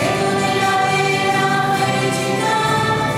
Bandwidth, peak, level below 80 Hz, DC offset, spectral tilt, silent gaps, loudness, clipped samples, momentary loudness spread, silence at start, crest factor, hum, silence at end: 16.5 kHz; -4 dBFS; -48 dBFS; under 0.1%; -4 dB/octave; none; -17 LUFS; under 0.1%; 2 LU; 0 s; 12 dB; none; 0 s